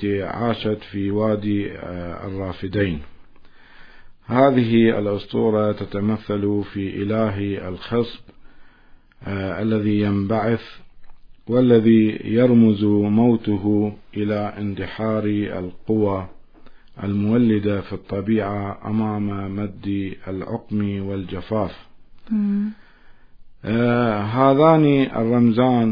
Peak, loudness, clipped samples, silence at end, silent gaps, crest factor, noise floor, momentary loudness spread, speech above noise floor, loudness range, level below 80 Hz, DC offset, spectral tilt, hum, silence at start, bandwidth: -2 dBFS; -21 LUFS; under 0.1%; 0 s; none; 18 dB; -48 dBFS; 13 LU; 29 dB; 8 LU; -48 dBFS; under 0.1%; -10.5 dB/octave; none; 0 s; 5.2 kHz